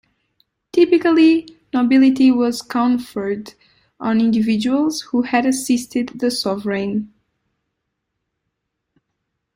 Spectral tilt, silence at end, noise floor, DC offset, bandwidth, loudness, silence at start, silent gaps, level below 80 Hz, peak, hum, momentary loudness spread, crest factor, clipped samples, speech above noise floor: -5 dB/octave; 2.5 s; -76 dBFS; under 0.1%; 16 kHz; -17 LUFS; 0.75 s; none; -60 dBFS; -2 dBFS; none; 11 LU; 16 dB; under 0.1%; 60 dB